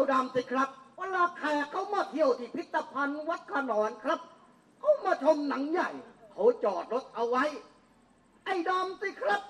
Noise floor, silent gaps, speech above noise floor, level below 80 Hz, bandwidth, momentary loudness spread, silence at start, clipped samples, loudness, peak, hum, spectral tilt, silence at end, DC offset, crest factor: -63 dBFS; none; 33 dB; -78 dBFS; 11 kHz; 8 LU; 0 s; under 0.1%; -30 LUFS; -12 dBFS; none; -4.5 dB/octave; 0 s; under 0.1%; 18 dB